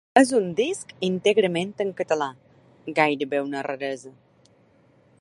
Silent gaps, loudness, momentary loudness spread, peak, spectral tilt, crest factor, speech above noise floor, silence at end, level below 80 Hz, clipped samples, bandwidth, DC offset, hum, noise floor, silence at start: none; -24 LUFS; 11 LU; -2 dBFS; -4.5 dB/octave; 22 dB; 35 dB; 1.1 s; -70 dBFS; under 0.1%; 11.5 kHz; under 0.1%; none; -59 dBFS; 0.15 s